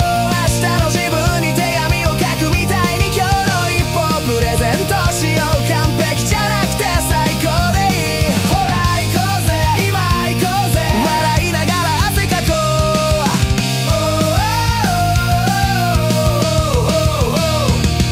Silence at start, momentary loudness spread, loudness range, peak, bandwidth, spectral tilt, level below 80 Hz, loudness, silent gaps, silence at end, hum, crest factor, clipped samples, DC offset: 0 s; 1 LU; 0 LU; -2 dBFS; 16 kHz; -4.5 dB/octave; -24 dBFS; -15 LUFS; none; 0 s; none; 12 dB; under 0.1%; under 0.1%